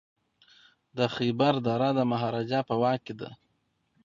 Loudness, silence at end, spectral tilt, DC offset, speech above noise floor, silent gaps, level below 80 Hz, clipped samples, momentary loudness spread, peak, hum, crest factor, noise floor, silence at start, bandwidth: -27 LUFS; 0.7 s; -7.5 dB/octave; under 0.1%; 47 dB; none; -68 dBFS; under 0.1%; 16 LU; -10 dBFS; none; 18 dB; -74 dBFS; 0.95 s; 7.4 kHz